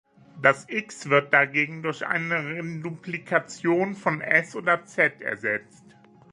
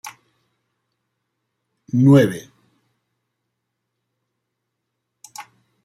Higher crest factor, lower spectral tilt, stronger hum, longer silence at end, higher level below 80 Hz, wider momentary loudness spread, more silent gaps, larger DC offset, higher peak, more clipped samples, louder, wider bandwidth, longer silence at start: about the same, 24 dB vs 20 dB; second, -5.5 dB/octave vs -7.5 dB/octave; neither; first, 0.7 s vs 0.45 s; second, -74 dBFS vs -62 dBFS; second, 11 LU vs 26 LU; neither; neither; about the same, -2 dBFS vs -2 dBFS; neither; second, -24 LUFS vs -15 LUFS; second, 11.5 kHz vs 14 kHz; first, 0.35 s vs 0.05 s